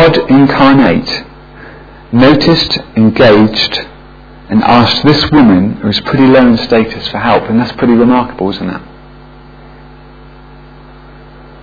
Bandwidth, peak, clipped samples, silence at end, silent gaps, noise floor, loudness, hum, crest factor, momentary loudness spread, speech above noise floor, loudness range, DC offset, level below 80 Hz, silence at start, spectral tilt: 5.4 kHz; 0 dBFS; 0.6%; 2.8 s; none; -34 dBFS; -8 LUFS; none; 10 dB; 10 LU; 26 dB; 7 LU; under 0.1%; -34 dBFS; 0 s; -7 dB/octave